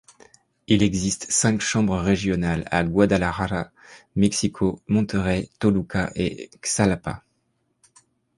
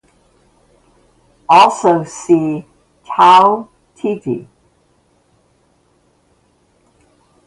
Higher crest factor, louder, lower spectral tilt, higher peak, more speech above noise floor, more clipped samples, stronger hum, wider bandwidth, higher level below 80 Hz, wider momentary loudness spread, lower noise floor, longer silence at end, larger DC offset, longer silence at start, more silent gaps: about the same, 20 dB vs 16 dB; second, -22 LUFS vs -13 LUFS; about the same, -5 dB/octave vs -5 dB/octave; second, -4 dBFS vs 0 dBFS; about the same, 49 dB vs 46 dB; neither; neither; about the same, 11.5 kHz vs 11.5 kHz; first, -42 dBFS vs -60 dBFS; second, 9 LU vs 16 LU; first, -71 dBFS vs -57 dBFS; second, 1.2 s vs 3.05 s; neither; second, 0.7 s vs 1.5 s; neither